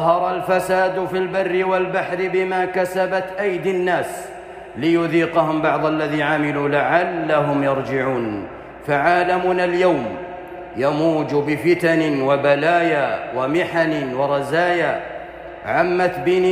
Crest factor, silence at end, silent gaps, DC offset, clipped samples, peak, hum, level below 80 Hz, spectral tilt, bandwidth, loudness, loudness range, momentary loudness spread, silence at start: 16 dB; 0 s; none; under 0.1%; under 0.1%; -4 dBFS; none; -54 dBFS; -6.5 dB/octave; 15.5 kHz; -19 LUFS; 2 LU; 11 LU; 0 s